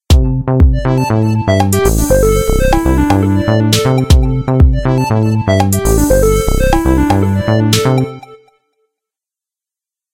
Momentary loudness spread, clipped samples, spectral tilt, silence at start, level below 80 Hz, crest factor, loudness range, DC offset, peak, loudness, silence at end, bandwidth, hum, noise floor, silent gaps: 2 LU; 0.2%; -6 dB/octave; 0.1 s; -16 dBFS; 12 dB; 3 LU; under 0.1%; 0 dBFS; -12 LUFS; 1.8 s; 17 kHz; none; -87 dBFS; none